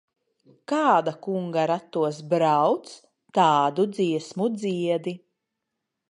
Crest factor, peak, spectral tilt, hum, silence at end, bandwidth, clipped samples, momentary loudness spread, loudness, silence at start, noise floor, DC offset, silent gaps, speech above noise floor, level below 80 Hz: 18 dB; -6 dBFS; -6 dB/octave; none; 0.95 s; 11 kHz; under 0.1%; 9 LU; -24 LUFS; 0.7 s; -82 dBFS; under 0.1%; none; 59 dB; -78 dBFS